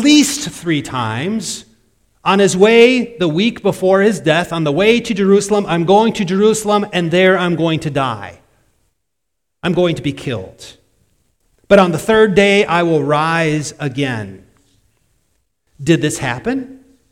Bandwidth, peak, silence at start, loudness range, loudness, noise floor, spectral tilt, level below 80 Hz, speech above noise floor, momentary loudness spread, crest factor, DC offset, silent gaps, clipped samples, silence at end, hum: 16 kHz; 0 dBFS; 0 s; 8 LU; -14 LUFS; -77 dBFS; -5 dB/octave; -48 dBFS; 63 dB; 13 LU; 16 dB; under 0.1%; none; under 0.1%; 0.35 s; none